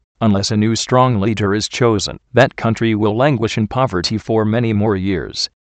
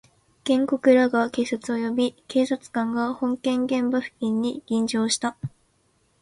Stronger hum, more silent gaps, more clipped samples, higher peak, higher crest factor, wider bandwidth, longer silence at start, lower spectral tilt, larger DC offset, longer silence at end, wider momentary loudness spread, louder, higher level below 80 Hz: neither; neither; neither; first, 0 dBFS vs -6 dBFS; about the same, 16 dB vs 18 dB; second, 9 kHz vs 11.5 kHz; second, 0.2 s vs 0.45 s; about the same, -5.5 dB/octave vs -4.5 dB/octave; neither; second, 0.15 s vs 0.75 s; second, 5 LU vs 8 LU; first, -16 LUFS vs -24 LUFS; first, -44 dBFS vs -64 dBFS